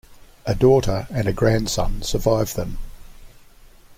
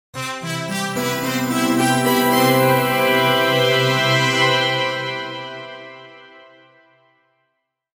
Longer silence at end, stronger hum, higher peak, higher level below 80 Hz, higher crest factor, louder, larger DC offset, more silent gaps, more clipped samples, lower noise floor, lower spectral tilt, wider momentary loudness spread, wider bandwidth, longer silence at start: second, 0.05 s vs 1.6 s; neither; about the same, -4 dBFS vs -2 dBFS; first, -32 dBFS vs -60 dBFS; about the same, 16 dB vs 16 dB; second, -21 LUFS vs -17 LUFS; neither; neither; neither; second, -47 dBFS vs -73 dBFS; first, -5.5 dB/octave vs -4 dB/octave; about the same, 14 LU vs 14 LU; second, 16.5 kHz vs 19 kHz; about the same, 0.1 s vs 0.15 s